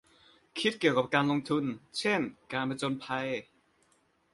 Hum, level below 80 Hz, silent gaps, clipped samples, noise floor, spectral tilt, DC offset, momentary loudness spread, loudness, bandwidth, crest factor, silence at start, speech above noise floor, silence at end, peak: none; -72 dBFS; none; under 0.1%; -70 dBFS; -5 dB/octave; under 0.1%; 8 LU; -31 LUFS; 11.5 kHz; 22 dB; 0.55 s; 39 dB; 0.9 s; -10 dBFS